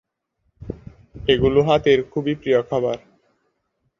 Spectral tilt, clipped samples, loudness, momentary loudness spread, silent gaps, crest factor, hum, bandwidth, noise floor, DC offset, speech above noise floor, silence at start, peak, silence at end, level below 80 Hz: -7 dB/octave; under 0.1%; -19 LUFS; 20 LU; none; 20 dB; none; 7.2 kHz; -71 dBFS; under 0.1%; 53 dB; 0.6 s; -2 dBFS; 1 s; -44 dBFS